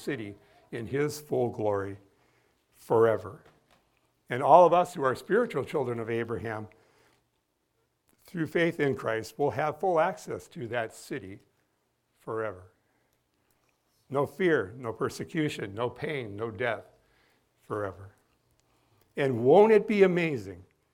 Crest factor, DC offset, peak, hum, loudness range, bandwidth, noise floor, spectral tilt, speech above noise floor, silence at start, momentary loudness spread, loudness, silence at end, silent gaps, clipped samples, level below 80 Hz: 24 dB; under 0.1%; -4 dBFS; none; 10 LU; 17 kHz; -76 dBFS; -6.5 dB/octave; 49 dB; 0 s; 18 LU; -28 LUFS; 0.3 s; none; under 0.1%; -68 dBFS